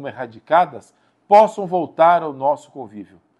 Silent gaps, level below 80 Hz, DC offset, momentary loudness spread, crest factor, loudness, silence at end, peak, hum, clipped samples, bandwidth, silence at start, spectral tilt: none; -72 dBFS; under 0.1%; 21 LU; 18 dB; -17 LUFS; 0.35 s; 0 dBFS; none; under 0.1%; 10.5 kHz; 0 s; -6 dB/octave